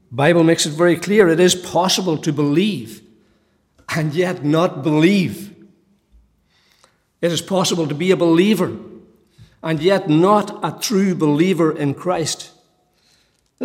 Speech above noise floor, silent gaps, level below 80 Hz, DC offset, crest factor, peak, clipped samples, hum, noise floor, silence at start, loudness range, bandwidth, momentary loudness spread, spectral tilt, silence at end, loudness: 44 dB; none; -60 dBFS; under 0.1%; 16 dB; -2 dBFS; under 0.1%; none; -60 dBFS; 0.1 s; 4 LU; 16.5 kHz; 11 LU; -5 dB/octave; 0 s; -17 LUFS